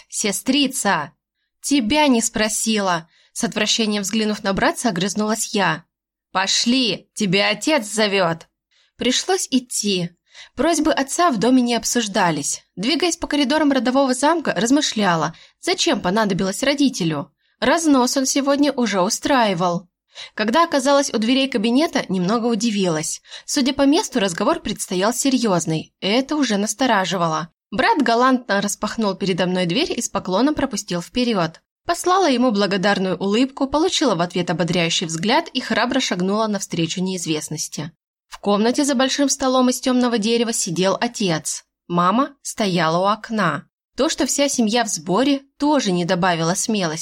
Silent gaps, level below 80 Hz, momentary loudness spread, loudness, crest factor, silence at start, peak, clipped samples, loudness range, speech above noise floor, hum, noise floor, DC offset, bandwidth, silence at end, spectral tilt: 31.71-31.76 s, 38.03-38.14 s, 43.73-43.78 s; -52 dBFS; 7 LU; -19 LUFS; 14 dB; 0.1 s; -6 dBFS; under 0.1%; 2 LU; 44 dB; none; -63 dBFS; under 0.1%; 16.5 kHz; 0 s; -3.5 dB/octave